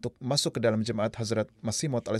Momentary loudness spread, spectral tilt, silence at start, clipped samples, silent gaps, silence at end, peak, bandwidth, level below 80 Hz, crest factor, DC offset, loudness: 4 LU; -4.5 dB/octave; 0.05 s; under 0.1%; none; 0 s; -12 dBFS; 14 kHz; -64 dBFS; 16 dB; under 0.1%; -29 LUFS